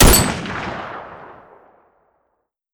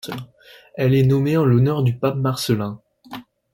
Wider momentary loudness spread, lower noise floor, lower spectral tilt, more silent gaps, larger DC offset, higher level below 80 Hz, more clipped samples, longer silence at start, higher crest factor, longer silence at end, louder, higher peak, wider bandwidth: first, 26 LU vs 21 LU; first, -71 dBFS vs -39 dBFS; second, -3.5 dB/octave vs -7 dB/octave; neither; neither; first, -24 dBFS vs -52 dBFS; neither; about the same, 0 s vs 0.05 s; about the same, 18 dB vs 14 dB; first, 1.4 s vs 0.35 s; about the same, -18 LUFS vs -19 LUFS; first, -2 dBFS vs -6 dBFS; first, over 20 kHz vs 16.5 kHz